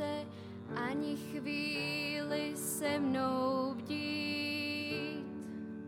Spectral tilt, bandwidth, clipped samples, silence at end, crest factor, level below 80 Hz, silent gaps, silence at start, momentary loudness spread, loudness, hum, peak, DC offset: -4 dB/octave; 16.5 kHz; under 0.1%; 0 s; 14 dB; -76 dBFS; none; 0 s; 10 LU; -36 LUFS; none; -22 dBFS; under 0.1%